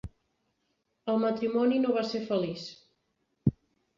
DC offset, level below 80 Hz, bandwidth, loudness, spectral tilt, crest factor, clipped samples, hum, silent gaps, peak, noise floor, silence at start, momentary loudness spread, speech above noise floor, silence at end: under 0.1%; -56 dBFS; 7.4 kHz; -29 LUFS; -7.5 dB/octave; 20 dB; under 0.1%; none; none; -12 dBFS; -78 dBFS; 0.05 s; 14 LU; 49 dB; 0.45 s